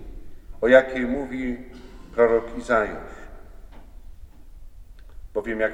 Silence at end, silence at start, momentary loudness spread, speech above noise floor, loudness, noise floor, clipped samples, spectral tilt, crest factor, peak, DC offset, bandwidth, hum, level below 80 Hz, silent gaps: 0 s; 0 s; 24 LU; 21 dB; -22 LUFS; -42 dBFS; under 0.1%; -6 dB/octave; 24 dB; 0 dBFS; under 0.1%; 9.8 kHz; none; -42 dBFS; none